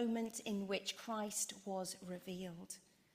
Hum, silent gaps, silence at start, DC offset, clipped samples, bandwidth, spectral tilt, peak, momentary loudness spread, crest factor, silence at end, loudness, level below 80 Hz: none; none; 0 s; under 0.1%; under 0.1%; 15.5 kHz; -3.5 dB/octave; -26 dBFS; 10 LU; 16 dB; 0.35 s; -43 LUFS; -80 dBFS